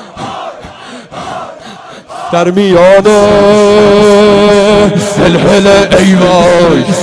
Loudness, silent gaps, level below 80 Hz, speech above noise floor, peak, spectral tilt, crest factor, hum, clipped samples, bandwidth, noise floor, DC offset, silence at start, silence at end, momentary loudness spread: -5 LUFS; none; -32 dBFS; 23 dB; 0 dBFS; -5.5 dB/octave; 6 dB; none; 2%; 11 kHz; -28 dBFS; under 0.1%; 0 s; 0 s; 19 LU